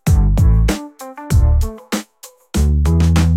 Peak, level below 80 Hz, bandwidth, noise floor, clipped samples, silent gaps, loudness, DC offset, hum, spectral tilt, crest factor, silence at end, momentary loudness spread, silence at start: -4 dBFS; -16 dBFS; 15.5 kHz; -43 dBFS; under 0.1%; none; -16 LUFS; under 0.1%; none; -6.5 dB/octave; 10 dB; 0 s; 11 LU; 0.05 s